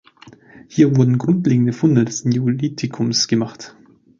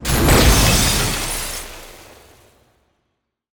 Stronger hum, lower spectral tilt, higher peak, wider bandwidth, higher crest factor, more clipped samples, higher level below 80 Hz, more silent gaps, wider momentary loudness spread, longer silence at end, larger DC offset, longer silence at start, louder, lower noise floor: neither; first, -6 dB/octave vs -3.5 dB/octave; about the same, -2 dBFS vs -2 dBFS; second, 7.6 kHz vs over 20 kHz; about the same, 16 dB vs 16 dB; neither; second, -58 dBFS vs -24 dBFS; neither; second, 11 LU vs 19 LU; second, 0.5 s vs 1.55 s; neither; first, 0.7 s vs 0 s; about the same, -17 LUFS vs -15 LUFS; second, -45 dBFS vs -73 dBFS